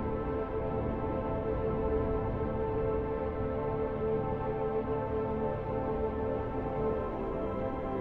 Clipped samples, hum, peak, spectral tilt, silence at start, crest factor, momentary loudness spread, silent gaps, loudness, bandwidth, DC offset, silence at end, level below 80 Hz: under 0.1%; none; -20 dBFS; -10.5 dB/octave; 0 s; 12 dB; 3 LU; none; -33 LUFS; 4.7 kHz; under 0.1%; 0 s; -42 dBFS